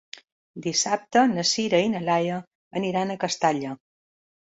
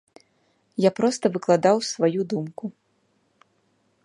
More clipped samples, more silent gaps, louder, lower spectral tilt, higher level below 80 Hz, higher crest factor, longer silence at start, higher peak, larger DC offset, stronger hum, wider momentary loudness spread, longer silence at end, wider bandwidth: neither; first, 2.47-2.71 s vs none; about the same, -24 LUFS vs -23 LUFS; second, -3.5 dB/octave vs -5.5 dB/octave; first, -66 dBFS vs -74 dBFS; about the same, 18 dB vs 20 dB; second, 0.55 s vs 0.8 s; about the same, -6 dBFS vs -4 dBFS; neither; neither; about the same, 14 LU vs 16 LU; second, 0.65 s vs 1.35 s; second, 8 kHz vs 11.5 kHz